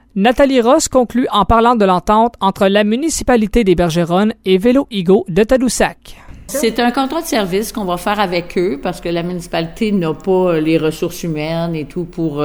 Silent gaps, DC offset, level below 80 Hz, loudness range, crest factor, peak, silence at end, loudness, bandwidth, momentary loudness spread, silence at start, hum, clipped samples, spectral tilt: none; under 0.1%; -34 dBFS; 5 LU; 14 dB; -2 dBFS; 0 s; -15 LUFS; over 20 kHz; 9 LU; 0.15 s; none; under 0.1%; -5 dB/octave